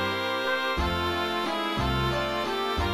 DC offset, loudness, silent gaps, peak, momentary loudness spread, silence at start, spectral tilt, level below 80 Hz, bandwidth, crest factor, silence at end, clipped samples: under 0.1%; -27 LUFS; none; -14 dBFS; 2 LU; 0 s; -5 dB/octave; -38 dBFS; 16 kHz; 12 dB; 0 s; under 0.1%